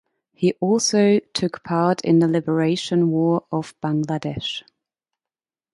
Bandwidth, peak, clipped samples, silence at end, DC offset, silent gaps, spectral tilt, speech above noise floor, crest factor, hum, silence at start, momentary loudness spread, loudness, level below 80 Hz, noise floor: 11.5 kHz; -6 dBFS; under 0.1%; 1.15 s; under 0.1%; none; -5.5 dB/octave; over 70 dB; 16 dB; none; 0.4 s; 9 LU; -21 LUFS; -58 dBFS; under -90 dBFS